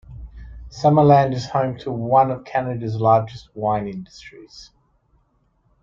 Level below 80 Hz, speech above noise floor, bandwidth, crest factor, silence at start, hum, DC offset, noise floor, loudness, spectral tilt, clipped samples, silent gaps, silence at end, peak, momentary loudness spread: -46 dBFS; 44 dB; 7.4 kHz; 18 dB; 0.1 s; none; under 0.1%; -63 dBFS; -19 LUFS; -8 dB/octave; under 0.1%; none; 1.2 s; -2 dBFS; 26 LU